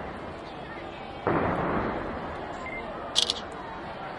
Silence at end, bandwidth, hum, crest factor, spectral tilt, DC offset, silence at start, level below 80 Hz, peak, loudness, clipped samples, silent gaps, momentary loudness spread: 0 s; 11.5 kHz; none; 26 dB; -3.5 dB/octave; under 0.1%; 0 s; -50 dBFS; -6 dBFS; -31 LUFS; under 0.1%; none; 13 LU